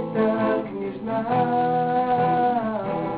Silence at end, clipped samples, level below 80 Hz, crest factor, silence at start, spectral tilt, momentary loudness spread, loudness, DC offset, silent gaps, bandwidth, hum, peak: 0 s; under 0.1%; -56 dBFS; 12 dB; 0 s; -11.5 dB/octave; 7 LU; -23 LUFS; under 0.1%; none; 4.8 kHz; none; -10 dBFS